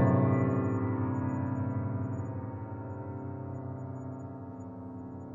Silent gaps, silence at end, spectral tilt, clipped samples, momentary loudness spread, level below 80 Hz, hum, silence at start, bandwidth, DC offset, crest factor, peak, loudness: none; 0 s; -11 dB/octave; under 0.1%; 15 LU; -68 dBFS; none; 0 s; 7.4 kHz; under 0.1%; 18 dB; -14 dBFS; -34 LUFS